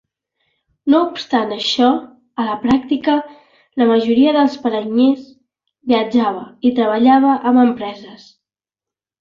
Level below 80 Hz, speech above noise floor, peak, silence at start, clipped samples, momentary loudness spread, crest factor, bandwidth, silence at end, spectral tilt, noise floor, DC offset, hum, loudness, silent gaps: -58 dBFS; 74 dB; -2 dBFS; 0.85 s; under 0.1%; 13 LU; 14 dB; 7.4 kHz; 1.05 s; -5.5 dB/octave; -89 dBFS; under 0.1%; none; -16 LUFS; none